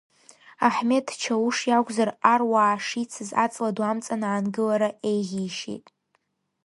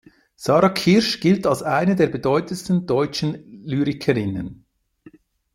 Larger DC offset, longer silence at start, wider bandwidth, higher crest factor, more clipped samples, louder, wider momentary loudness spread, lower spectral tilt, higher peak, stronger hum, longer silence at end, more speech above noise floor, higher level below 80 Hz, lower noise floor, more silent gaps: neither; first, 0.6 s vs 0.4 s; second, 11.5 kHz vs 16 kHz; first, 24 dB vs 18 dB; neither; second, -24 LUFS vs -20 LUFS; about the same, 9 LU vs 11 LU; second, -4.5 dB/octave vs -6 dB/octave; about the same, -2 dBFS vs -4 dBFS; neither; second, 0.85 s vs 1 s; first, 48 dB vs 31 dB; second, -74 dBFS vs -52 dBFS; first, -72 dBFS vs -51 dBFS; neither